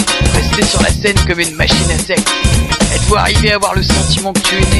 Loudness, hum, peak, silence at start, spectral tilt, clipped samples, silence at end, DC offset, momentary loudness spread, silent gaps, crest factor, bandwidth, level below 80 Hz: -11 LUFS; none; 0 dBFS; 0 s; -3.5 dB/octave; under 0.1%; 0 s; under 0.1%; 2 LU; none; 12 dB; 13.5 kHz; -18 dBFS